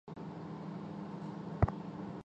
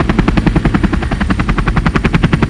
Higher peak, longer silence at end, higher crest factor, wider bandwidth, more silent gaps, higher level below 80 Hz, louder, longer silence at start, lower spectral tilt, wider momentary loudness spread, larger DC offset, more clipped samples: second, -14 dBFS vs 0 dBFS; about the same, 0.05 s vs 0 s; first, 26 dB vs 12 dB; second, 7.8 kHz vs 11 kHz; neither; second, -48 dBFS vs -18 dBFS; second, -41 LUFS vs -14 LUFS; about the same, 0.05 s vs 0 s; first, -9 dB/octave vs -7 dB/octave; first, 10 LU vs 3 LU; neither; second, under 0.1% vs 0.6%